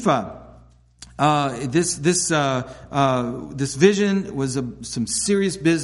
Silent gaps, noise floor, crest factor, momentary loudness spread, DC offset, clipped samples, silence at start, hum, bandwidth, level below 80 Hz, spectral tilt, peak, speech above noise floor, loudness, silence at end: none; -50 dBFS; 20 dB; 10 LU; under 0.1%; under 0.1%; 0 s; none; 11.5 kHz; -50 dBFS; -4.5 dB/octave; -2 dBFS; 29 dB; -21 LUFS; 0 s